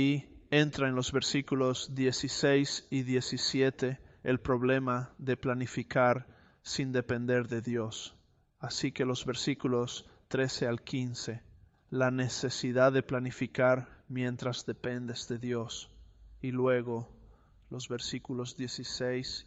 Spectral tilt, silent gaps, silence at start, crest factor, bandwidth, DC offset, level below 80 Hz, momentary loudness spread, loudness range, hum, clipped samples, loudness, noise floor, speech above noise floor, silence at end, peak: -5 dB/octave; none; 0 s; 20 dB; 8.2 kHz; under 0.1%; -60 dBFS; 11 LU; 5 LU; none; under 0.1%; -32 LUFS; -59 dBFS; 27 dB; 0.05 s; -12 dBFS